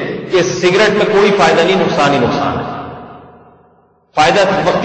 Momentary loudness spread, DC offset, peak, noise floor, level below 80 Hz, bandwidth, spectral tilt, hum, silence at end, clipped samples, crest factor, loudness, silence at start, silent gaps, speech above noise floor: 13 LU; under 0.1%; 0 dBFS; -51 dBFS; -46 dBFS; 8.8 kHz; -4.5 dB/octave; none; 0 s; under 0.1%; 12 dB; -12 LUFS; 0 s; none; 39 dB